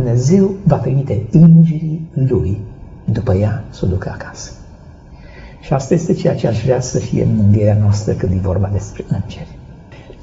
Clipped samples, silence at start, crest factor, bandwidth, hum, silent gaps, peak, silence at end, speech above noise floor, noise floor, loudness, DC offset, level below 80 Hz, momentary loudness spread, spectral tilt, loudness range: under 0.1%; 0 s; 14 dB; 7.8 kHz; none; none; 0 dBFS; 0 s; 24 dB; -37 dBFS; -15 LUFS; under 0.1%; -36 dBFS; 17 LU; -9.5 dB/octave; 6 LU